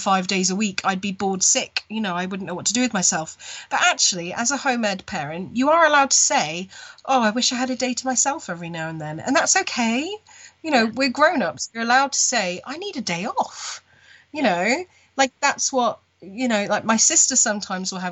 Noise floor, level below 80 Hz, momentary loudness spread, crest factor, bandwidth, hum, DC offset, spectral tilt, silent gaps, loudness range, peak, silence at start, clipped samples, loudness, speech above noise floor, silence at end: -52 dBFS; -66 dBFS; 14 LU; 18 dB; 8.6 kHz; none; under 0.1%; -2 dB/octave; none; 4 LU; -4 dBFS; 0 s; under 0.1%; -20 LUFS; 31 dB; 0 s